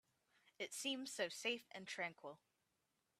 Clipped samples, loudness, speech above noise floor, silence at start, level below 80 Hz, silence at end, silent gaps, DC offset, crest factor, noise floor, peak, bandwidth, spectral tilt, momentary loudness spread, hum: under 0.1%; -46 LUFS; 39 dB; 0.6 s; under -90 dBFS; 0.85 s; none; under 0.1%; 22 dB; -87 dBFS; -28 dBFS; 15.5 kHz; -1.5 dB/octave; 15 LU; none